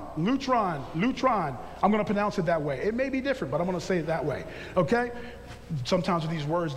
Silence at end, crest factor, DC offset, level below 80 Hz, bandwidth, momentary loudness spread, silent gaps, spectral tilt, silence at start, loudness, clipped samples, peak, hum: 0 s; 18 dB; under 0.1%; -50 dBFS; 14 kHz; 9 LU; none; -6.5 dB/octave; 0 s; -28 LUFS; under 0.1%; -10 dBFS; none